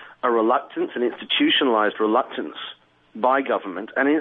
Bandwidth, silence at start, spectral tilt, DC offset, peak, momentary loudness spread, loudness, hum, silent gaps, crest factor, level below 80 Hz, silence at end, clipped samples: 4.1 kHz; 0 s; -7 dB/octave; under 0.1%; -6 dBFS; 12 LU; -21 LUFS; none; none; 16 dB; -78 dBFS; 0 s; under 0.1%